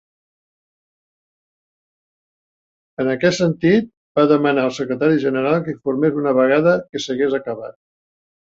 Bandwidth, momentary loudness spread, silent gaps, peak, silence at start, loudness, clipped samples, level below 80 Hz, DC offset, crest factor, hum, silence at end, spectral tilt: 8 kHz; 9 LU; 3.97-4.15 s; -2 dBFS; 3 s; -18 LUFS; under 0.1%; -60 dBFS; under 0.1%; 18 dB; none; 0.85 s; -6 dB/octave